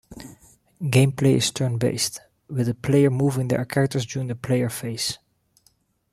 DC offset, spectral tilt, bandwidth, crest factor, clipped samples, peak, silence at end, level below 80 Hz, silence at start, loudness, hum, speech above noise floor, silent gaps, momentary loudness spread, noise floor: under 0.1%; -5.5 dB/octave; 15 kHz; 20 dB; under 0.1%; -4 dBFS; 0.95 s; -56 dBFS; 0.1 s; -23 LUFS; none; 42 dB; none; 13 LU; -64 dBFS